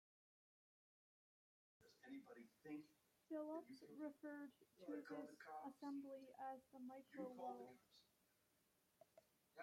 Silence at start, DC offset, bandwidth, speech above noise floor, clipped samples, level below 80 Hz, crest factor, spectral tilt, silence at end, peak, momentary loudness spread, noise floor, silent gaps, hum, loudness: 1.8 s; under 0.1%; 16 kHz; 28 dB; under 0.1%; under -90 dBFS; 18 dB; -5.5 dB/octave; 0 s; -40 dBFS; 9 LU; -83 dBFS; none; none; -57 LUFS